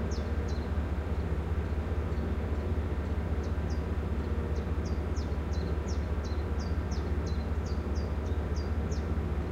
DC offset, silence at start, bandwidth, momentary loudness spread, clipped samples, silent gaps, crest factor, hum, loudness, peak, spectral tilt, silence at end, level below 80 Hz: under 0.1%; 0 s; 7.4 kHz; 1 LU; under 0.1%; none; 12 dB; none; -33 LUFS; -20 dBFS; -7.5 dB/octave; 0 s; -34 dBFS